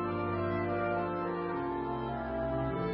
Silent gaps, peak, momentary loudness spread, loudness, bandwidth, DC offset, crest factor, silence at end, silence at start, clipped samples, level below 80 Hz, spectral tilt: none; -22 dBFS; 3 LU; -34 LUFS; 5.4 kHz; under 0.1%; 12 dB; 0 s; 0 s; under 0.1%; -50 dBFS; -6.5 dB/octave